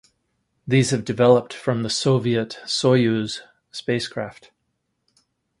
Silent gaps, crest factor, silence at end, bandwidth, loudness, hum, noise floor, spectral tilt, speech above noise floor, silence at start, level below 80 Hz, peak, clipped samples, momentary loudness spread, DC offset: none; 20 dB; 1.3 s; 11.5 kHz; -21 LUFS; none; -74 dBFS; -5.5 dB/octave; 54 dB; 0.65 s; -58 dBFS; -2 dBFS; under 0.1%; 15 LU; under 0.1%